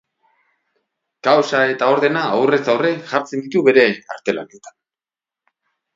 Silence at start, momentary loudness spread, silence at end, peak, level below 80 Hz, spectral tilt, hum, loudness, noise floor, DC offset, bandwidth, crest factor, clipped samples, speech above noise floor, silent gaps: 1.25 s; 10 LU; 1.25 s; 0 dBFS; -68 dBFS; -5 dB/octave; none; -17 LUFS; under -90 dBFS; under 0.1%; 7.6 kHz; 18 dB; under 0.1%; over 73 dB; none